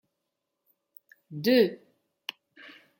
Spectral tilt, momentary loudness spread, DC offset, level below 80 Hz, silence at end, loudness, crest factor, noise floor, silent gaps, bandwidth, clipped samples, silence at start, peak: -5.5 dB/octave; 27 LU; under 0.1%; -82 dBFS; 1.25 s; -25 LUFS; 20 dB; -83 dBFS; none; 17 kHz; under 0.1%; 1.3 s; -10 dBFS